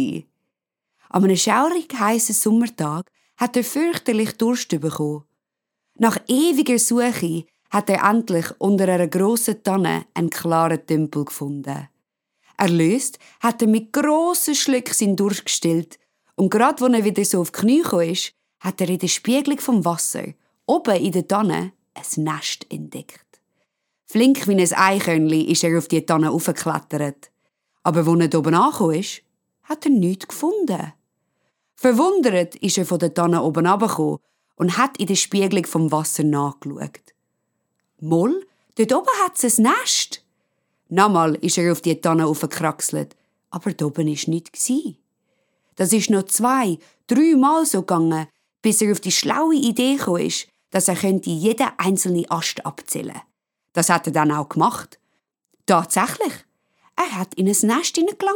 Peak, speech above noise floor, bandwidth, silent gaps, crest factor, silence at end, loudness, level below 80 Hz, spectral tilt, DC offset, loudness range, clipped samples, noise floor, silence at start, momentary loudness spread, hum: 0 dBFS; 63 dB; 19 kHz; none; 20 dB; 0 s; -19 LUFS; -72 dBFS; -4.5 dB/octave; under 0.1%; 4 LU; under 0.1%; -82 dBFS; 0 s; 11 LU; none